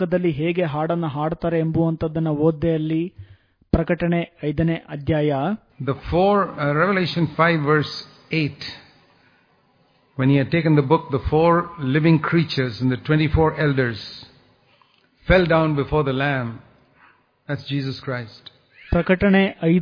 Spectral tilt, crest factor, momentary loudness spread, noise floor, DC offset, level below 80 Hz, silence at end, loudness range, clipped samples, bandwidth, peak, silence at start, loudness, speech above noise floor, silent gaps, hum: -8.5 dB/octave; 20 dB; 11 LU; -60 dBFS; under 0.1%; -40 dBFS; 0 s; 4 LU; under 0.1%; 5.2 kHz; -2 dBFS; 0 s; -21 LUFS; 40 dB; none; none